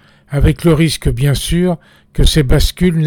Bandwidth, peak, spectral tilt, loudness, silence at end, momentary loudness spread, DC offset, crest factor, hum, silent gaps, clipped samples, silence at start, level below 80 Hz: 19 kHz; -2 dBFS; -6 dB/octave; -14 LUFS; 0 s; 8 LU; under 0.1%; 10 dB; none; none; under 0.1%; 0.3 s; -18 dBFS